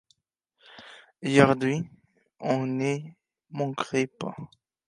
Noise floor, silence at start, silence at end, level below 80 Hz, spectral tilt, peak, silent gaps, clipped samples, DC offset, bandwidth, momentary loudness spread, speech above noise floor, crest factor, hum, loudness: -74 dBFS; 0.75 s; 0.4 s; -64 dBFS; -6 dB/octave; -4 dBFS; none; under 0.1%; under 0.1%; 11 kHz; 26 LU; 49 dB; 26 dB; none; -27 LUFS